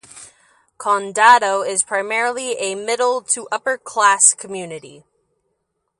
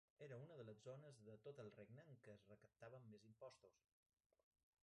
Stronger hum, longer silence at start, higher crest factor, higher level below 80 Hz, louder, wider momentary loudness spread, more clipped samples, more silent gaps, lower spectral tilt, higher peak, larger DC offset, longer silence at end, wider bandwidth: neither; about the same, 0.15 s vs 0.2 s; about the same, 20 dB vs 18 dB; first, -72 dBFS vs under -90 dBFS; first, -16 LUFS vs -63 LUFS; first, 16 LU vs 7 LU; neither; neither; second, -0.5 dB/octave vs -6.5 dB/octave; first, 0 dBFS vs -46 dBFS; neither; about the same, 1.1 s vs 1.05 s; first, 11.5 kHz vs 9.6 kHz